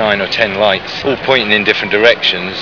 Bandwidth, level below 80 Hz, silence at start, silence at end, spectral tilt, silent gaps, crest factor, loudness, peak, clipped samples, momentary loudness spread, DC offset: 5.4 kHz; -48 dBFS; 0 s; 0 s; -4.5 dB/octave; none; 12 dB; -12 LUFS; 0 dBFS; 0.3%; 6 LU; 0.5%